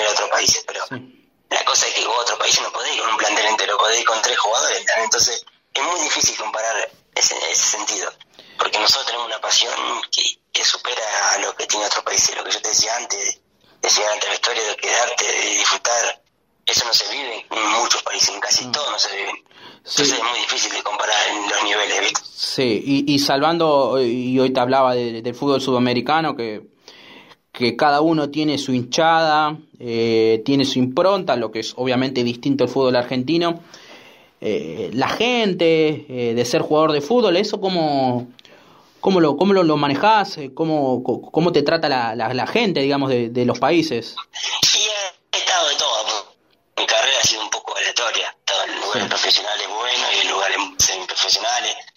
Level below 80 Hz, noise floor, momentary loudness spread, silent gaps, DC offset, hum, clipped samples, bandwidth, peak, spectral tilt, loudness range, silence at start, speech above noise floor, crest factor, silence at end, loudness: -60 dBFS; -62 dBFS; 8 LU; none; under 0.1%; none; under 0.1%; 16 kHz; -4 dBFS; -2 dB/octave; 2 LU; 0 s; 44 dB; 16 dB; 0.1 s; -18 LUFS